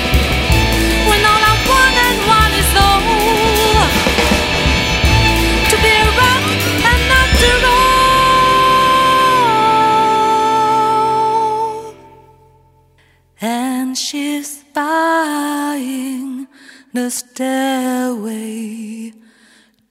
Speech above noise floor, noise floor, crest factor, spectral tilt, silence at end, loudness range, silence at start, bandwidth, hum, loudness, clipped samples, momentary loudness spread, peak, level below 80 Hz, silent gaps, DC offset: 33 dB; -52 dBFS; 14 dB; -3.5 dB/octave; 0.8 s; 10 LU; 0 s; 16.5 kHz; none; -12 LUFS; under 0.1%; 13 LU; 0 dBFS; -24 dBFS; none; under 0.1%